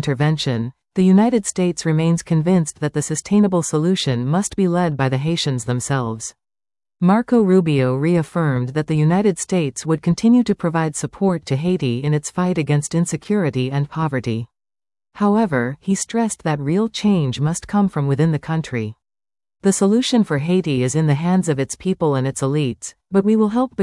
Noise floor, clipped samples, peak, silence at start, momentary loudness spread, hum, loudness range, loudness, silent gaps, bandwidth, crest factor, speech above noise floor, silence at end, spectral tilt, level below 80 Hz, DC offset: under -90 dBFS; under 0.1%; -4 dBFS; 0 s; 7 LU; none; 3 LU; -19 LUFS; none; 12 kHz; 14 dB; over 72 dB; 0 s; -6 dB/octave; -52 dBFS; under 0.1%